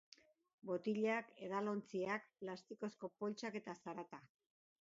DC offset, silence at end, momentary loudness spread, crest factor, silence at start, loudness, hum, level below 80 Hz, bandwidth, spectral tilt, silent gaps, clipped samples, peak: under 0.1%; 0.6 s; 12 LU; 18 dB; 0.65 s; -45 LUFS; none; -88 dBFS; 7.6 kHz; -4.5 dB/octave; none; under 0.1%; -28 dBFS